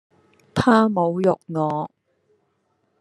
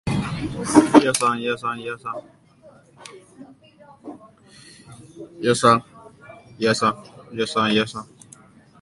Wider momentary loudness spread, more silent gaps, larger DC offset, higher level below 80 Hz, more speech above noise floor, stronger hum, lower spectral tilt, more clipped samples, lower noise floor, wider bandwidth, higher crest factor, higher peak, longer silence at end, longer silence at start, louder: second, 12 LU vs 26 LU; neither; neither; second, -60 dBFS vs -52 dBFS; first, 50 dB vs 30 dB; neither; first, -7 dB/octave vs -4.5 dB/octave; neither; first, -69 dBFS vs -51 dBFS; about the same, 11.5 kHz vs 11.5 kHz; about the same, 20 dB vs 24 dB; about the same, -2 dBFS vs 0 dBFS; first, 1.15 s vs 0.75 s; first, 0.55 s vs 0.05 s; about the same, -20 LUFS vs -20 LUFS